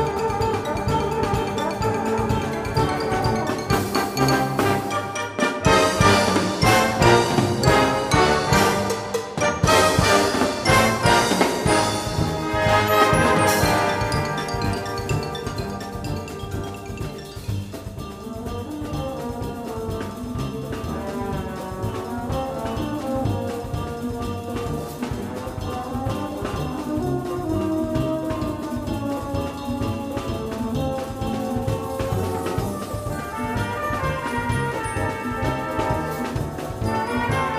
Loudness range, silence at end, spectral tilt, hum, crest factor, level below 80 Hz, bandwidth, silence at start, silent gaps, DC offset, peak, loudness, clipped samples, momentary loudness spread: 11 LU; 0 s; -5 dB/octave; none; 20 dB; -38 dBFS; 15.5 kHz; 0 s; none; under 0.1%; -2 dBFS; -22 LUFS; under 0.1%; 12 LU